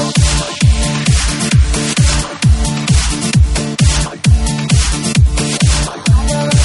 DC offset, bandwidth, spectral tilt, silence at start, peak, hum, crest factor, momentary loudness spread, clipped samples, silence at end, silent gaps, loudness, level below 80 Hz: under 0.1%; 11.5 kHz; -4.5 dB/octave; 0 s; 0 dBFS; none; 12 dB; 2 LU; under 0.1%; 0 s; none; -13 LUFS; -16 dBFS